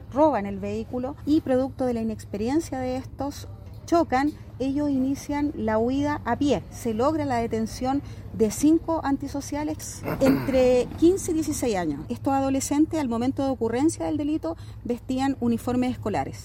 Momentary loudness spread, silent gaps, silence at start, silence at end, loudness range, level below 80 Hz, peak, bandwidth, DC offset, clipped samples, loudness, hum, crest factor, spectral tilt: 10 LU; none; 0 s; 0 s; 4 LU; -46 dBFS; -8 dBFS; 16.5 kHz; under 0.1%; under 0.1%; -25 LUFS; none; 16 dB; -6 dB/octave